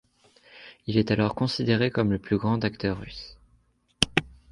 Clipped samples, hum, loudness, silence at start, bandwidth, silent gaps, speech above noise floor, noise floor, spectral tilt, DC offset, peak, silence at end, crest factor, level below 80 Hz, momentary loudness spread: under 0.1%; none; -26 LUFS; 0.55 s; 11.5 kHz; none; 40 dB; -65 dBFS; -5.5 dB/octave; under 0.1%; 0 dBFS; 0.2 s; 26 dB; -50 dBFS; 17 LU